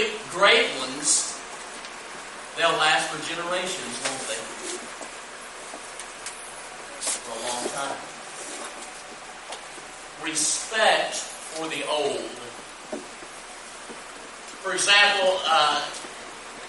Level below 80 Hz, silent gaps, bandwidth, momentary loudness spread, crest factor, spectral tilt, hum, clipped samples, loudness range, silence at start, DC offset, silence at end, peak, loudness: -62 dBFS; none; 11.5 kHz; 19 LU; 22 dB; 0 dB/octave; none; under 0.1%; 10 LU; 0 s; under 0.1%; 0 s; -6 dBFS; -24 LUFS